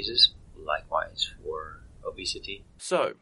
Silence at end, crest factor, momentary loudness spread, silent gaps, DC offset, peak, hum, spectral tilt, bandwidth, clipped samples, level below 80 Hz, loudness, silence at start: 0.1 s; 22 dB; 20 LU; none; under 0.1%; -8 dBFS; none; -2 dB/octave; 12 kHz; under 0.1%; -52 dBFS; -27 LUFS; 0 s